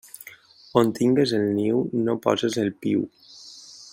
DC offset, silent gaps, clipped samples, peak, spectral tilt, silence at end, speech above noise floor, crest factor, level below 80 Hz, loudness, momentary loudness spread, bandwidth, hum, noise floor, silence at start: under 0.1%; none; under 0.1%; -4 dBFS; -6 dB/octave; 0.05 s; 26 dB; 20 dB; -66 dBFS; -23 LUFS; 21 LU; 16 kHz; none; -48 dBFS; 0.25 s